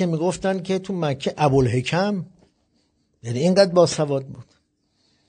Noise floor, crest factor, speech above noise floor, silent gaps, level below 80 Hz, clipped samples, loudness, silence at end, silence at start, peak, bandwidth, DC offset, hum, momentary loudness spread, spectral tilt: -67 dBFS; 20 dB; 47 dB; none; -52 dBFS; under 0.1%; -21 LUFS; 0.85 s; 0 s; -2 dBFS; 9.4 kHz; under 0.1%; none; 13 LU; -6 dB/octave